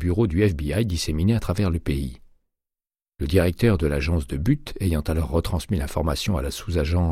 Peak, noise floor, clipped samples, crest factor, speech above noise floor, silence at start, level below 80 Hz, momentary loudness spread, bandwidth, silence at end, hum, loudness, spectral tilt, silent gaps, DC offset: -6 dBFS; under -90 dBFS; under 0.1%; 18 dB; over 68 dB; 0 s; -32 dBFS; 6 LU; 15.5 kHz; 0 s; none; -24 LUFS; -6.5 dB/octave; none; under 0.1%